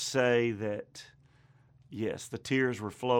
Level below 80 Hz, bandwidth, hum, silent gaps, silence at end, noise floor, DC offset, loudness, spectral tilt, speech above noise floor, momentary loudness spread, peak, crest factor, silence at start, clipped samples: -70 dBFS; 18 kHz; none; none; 0 s; -62 dBFS; under 0.1%; -31 LUFS; -5 dB/octave; 31 dB; 19 LU; -14 dBFS; 18 dB; 0 s; under 0.1%